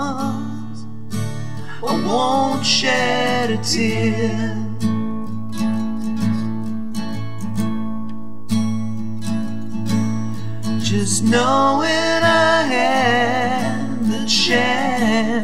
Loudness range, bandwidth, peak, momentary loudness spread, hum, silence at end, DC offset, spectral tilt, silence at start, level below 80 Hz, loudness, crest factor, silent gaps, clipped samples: 8 LU; 15 kHz; -2 dBFS; 12 LU; none; 0 s; 6%; -4.5 dB/octave; 0 s; -52 dBFS; -19 LUFS; 18 dB; none; under 0.1%